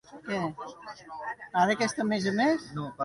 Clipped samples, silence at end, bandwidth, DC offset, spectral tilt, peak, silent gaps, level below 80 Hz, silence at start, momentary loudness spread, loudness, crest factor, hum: under 0.1%; 0 s; 11.5 kHz; under 0.1%; -5 dB/octave; -12 dBFS; none; -66 dBFS; 0.1 s; 16 LU; -29 LUFS; 18 dB; none